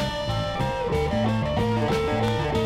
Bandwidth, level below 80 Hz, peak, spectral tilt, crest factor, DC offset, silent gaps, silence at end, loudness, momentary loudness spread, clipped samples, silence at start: 15.5 kHz; -38 dBFS; -12 dBFS; -6.5 dB/octave; 12 dB; under 0.1%; none; 0 s; -25 LUFS; 3 LU; under 0.1%; 0 s